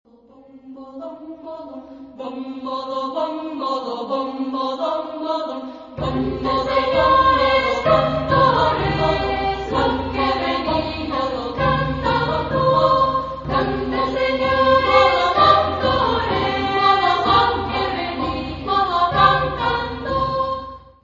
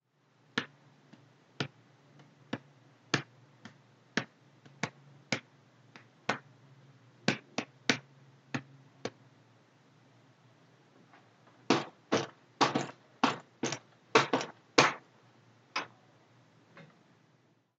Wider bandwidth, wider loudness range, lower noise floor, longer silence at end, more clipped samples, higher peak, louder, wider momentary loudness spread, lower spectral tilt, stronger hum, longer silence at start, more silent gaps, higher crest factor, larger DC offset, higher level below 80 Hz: second, 7.6 kHz vs 9 kHz; about the same, 9 LU vs 11 LU; second, -47 dBFS vs -69 dBFS; second, 0.25 s vs 0.95 s; neither; first, 0 dBFS vs -6 dBFS; first, -19 LUFS vs -34 LUFS; about the same, 15 LU vs 17 LU; first, -6.5 dB/octave vs -3.5 dB/octave; neither; about the same, 0.55 s vs 0.55 s; neither; second, 20 dB vs 32 dB; neither; first, -38 dBFS vs -86 dBFS